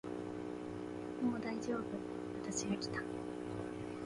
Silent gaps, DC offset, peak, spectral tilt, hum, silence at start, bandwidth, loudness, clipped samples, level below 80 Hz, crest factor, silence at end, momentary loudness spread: none; under 0.1%; -26 dBFS; -5 dB/octave; none; 0.05 s; 11.5 kHz; -42 LUFS; under 0.1%; -66 dBFS; 14 dB; 0 s; 6 LU